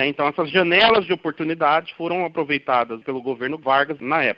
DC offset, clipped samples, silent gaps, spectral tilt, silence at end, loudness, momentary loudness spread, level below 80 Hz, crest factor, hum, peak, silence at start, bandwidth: under 0.1%; under 0.1%; none; -7 dB/octave; 0.05 s; -20 LUFS; 11 LU; -60 dBFS; 18 dB; none; -4 dBFS; 0 s; 5.8 kHz